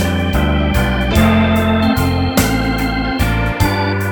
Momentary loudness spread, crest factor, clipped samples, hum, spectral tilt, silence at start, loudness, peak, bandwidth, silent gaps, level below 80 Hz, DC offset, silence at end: 5 LU; 14 dB; under 0.1%; none; -5.5 dB/octave; 0 s; -15 LUFS; 0 dBFS; over 20 kHz; none; -22 dBFS; under 0.1%; 0 s